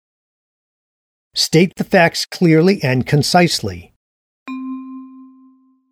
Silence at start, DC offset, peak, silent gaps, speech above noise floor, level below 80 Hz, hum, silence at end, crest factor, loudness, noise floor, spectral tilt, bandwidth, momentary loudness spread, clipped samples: 1.35 s; under 0.1%; 0 dBFS; 3.96-4.46 s; 37 dB; -52 dBFS; none; 0.7 s; 18 dB; -14 LUFS; -51 dBFS; -5 dB/octave; 16 kHz; 18 LU; under 0.1%